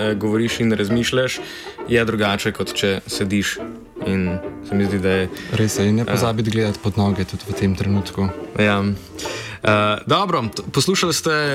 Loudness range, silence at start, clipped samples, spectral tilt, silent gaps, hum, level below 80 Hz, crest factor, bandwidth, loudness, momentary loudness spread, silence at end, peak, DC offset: 2 LU; 0 s; under 0.1%; -5 dB/octave; none; none; -46 dBFS; 16 dB; 16 kHz; -20 LUFS; 8 LU; 0 s; -4 dBFS; under 0.1%